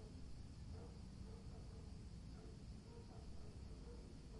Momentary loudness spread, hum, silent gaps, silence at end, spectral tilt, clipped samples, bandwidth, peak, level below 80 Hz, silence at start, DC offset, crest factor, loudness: 2 LU; none; none; 0 s; -6.5 dB/octave; under 0.1%; 11 kHz; -44 dBFS; -58 dBFS; 0 s; under 0.1%; 12 dB; -57 LUFS